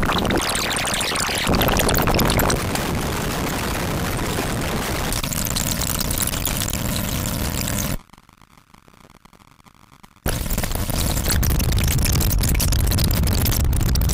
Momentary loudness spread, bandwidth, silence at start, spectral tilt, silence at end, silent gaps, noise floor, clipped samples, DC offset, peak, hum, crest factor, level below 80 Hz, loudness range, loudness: 5 LU; 16.5 kHz; 0 s; -4 dB/octave; 0 s; none; -51 dBFS; under 0.1%; under 0.1%; -8 dBFS; none; 14 dB; -26 dBFS; 8 LU; -21 LUFS